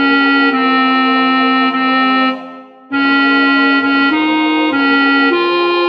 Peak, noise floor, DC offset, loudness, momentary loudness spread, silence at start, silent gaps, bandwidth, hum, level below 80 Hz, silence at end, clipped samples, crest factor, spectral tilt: -2 dBFS; -33 dBFS; under 0.1%; -11 LUFS; 3 LU; 0 s; none; 5.8 kHz; none; -68 dBFS; 0 s; under 0.1%; 10 dB; -5 dB/octave